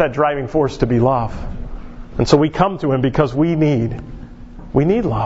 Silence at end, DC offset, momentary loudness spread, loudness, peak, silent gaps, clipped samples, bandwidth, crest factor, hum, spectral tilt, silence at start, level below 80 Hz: 0 s; under 0.1%; 19 LU; -17 LUFS; 0 dBFS; none; under 0.1%; 8 kHz; 18 dB; none; -7.5 dB/octave; 0 s; -32 dBFS